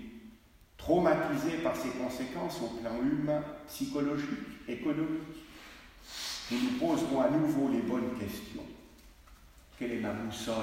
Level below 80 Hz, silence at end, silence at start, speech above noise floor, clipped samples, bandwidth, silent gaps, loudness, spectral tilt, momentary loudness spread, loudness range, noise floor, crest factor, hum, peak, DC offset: -58 dBFS; 0 s; 0 s; 26 dB; under 0.1%; 16 kHz; none; -33 LUFS; -5.5 dB/octave; 18 LU; 4 LU; -58 dBFS; 18 dB; none; -16 dBFS; under 0.1%